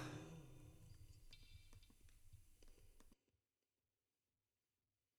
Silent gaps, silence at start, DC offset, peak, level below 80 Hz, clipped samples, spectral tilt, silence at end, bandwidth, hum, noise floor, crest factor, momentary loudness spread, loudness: none; 0 s; under 0.1%; -40 dBFS; -70 dBFS; under 0.1%; -5 dB/octave; 1.85 s; 17.5 kHz; none; under -90 dBFS; 22 dB; 11 LU; -62 LUFS